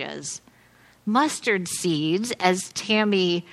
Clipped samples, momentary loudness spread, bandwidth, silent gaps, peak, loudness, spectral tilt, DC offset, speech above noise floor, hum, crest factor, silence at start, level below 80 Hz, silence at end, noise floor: under 0.1%; 12 LU; 13.5 kHz; none; -4 dBFS; -23 LUFS; -4 dB/octave; under 0.1%; 32 dB; none; 22 dB; 0 s; -68 dBFS; 0 s; -55 dBFS